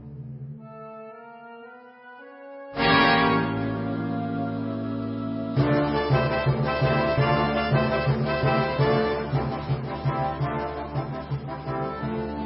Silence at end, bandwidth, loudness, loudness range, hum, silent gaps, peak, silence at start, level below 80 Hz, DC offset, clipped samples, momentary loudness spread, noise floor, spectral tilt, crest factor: 0 s; 5.8 kHz; -25 LUFS; 4 LU; none; none; -6 dBFS; 0 s; -44 dBFS; under 0.1%; under 0.1%; 20 LU; -46 dBFS; -11 dB/octave; 20 dB